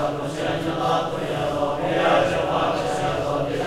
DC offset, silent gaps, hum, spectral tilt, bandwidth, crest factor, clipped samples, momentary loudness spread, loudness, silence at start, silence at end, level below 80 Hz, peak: under 0.1%; none; none; -5.5 dB/octave; 15.5 kHz; 14 dB; under 0.1%; 6 LU; -23 LUFS; 0 s; 0 s; -46 dBFS; -8 dBFS